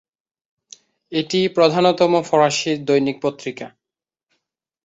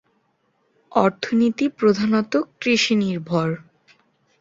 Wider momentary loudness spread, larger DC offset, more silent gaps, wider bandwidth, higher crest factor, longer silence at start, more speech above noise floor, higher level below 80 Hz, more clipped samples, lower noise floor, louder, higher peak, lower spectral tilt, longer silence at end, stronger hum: first, 15 LU vs 6 LU; neither; neither; about the same, 8.2 kHz vs 7.8 kHz; about the same, 18 dB vs 20 dB; first, 1.1 s vs 0.9 s; first, 71 dB vs 47 dB; about the same, -66 dBFS vs -62 dBFS; neither; first, -88 dBFS vs -67 dBFS; about the same, -18 LUFS vs -20 LUFS; about the same, -2 dBFS vs -2 dBFS; about the same, -4.5 dB/octave vs -5.5 dB/octave; first, 1.2 s vs 0.8 s; neither